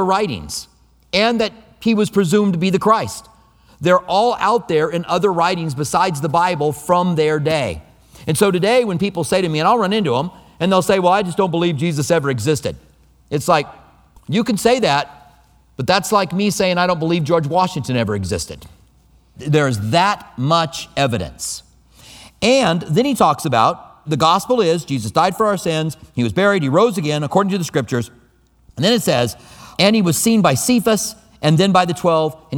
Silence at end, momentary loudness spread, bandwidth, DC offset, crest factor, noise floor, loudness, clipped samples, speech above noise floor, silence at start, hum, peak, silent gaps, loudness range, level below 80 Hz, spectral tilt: 0 s; 10 LU; 20 kHz; under 0.1%; 18 dB; -54 dBFS; -17 LUFS; under 0.1%; 37 dB; 0 s; none; 0 dBFS; none; 3 LU; -48 dBFS; -5 dB/octave